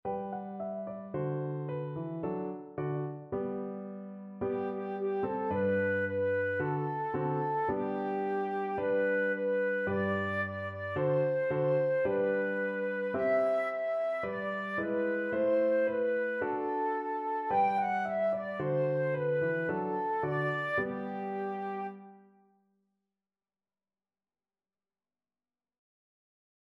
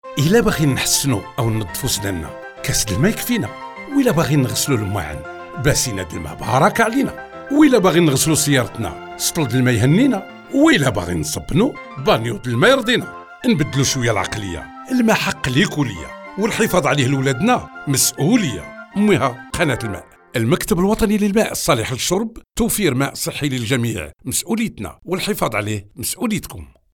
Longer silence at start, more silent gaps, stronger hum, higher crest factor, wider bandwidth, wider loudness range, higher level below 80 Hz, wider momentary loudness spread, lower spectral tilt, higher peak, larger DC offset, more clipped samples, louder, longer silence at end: about the same, 0.05 s vs 0.05 s; neither; neither; about the same, 14 dB vs 16 dB; second, 5.6 kHz vs 19 kHz; first, 7 LU vs 4 LU; second, -70 dBFS vs -40 dBFS; second, 9 LU vs 12 LU; first, -9 dB/octave vs -4.5 dB/octave; second, -18 dBFS vs -2 dBFS; neither; neither; second, -32 LUFS vs -18 LUFS; first, 4.5 s vs 0.3 s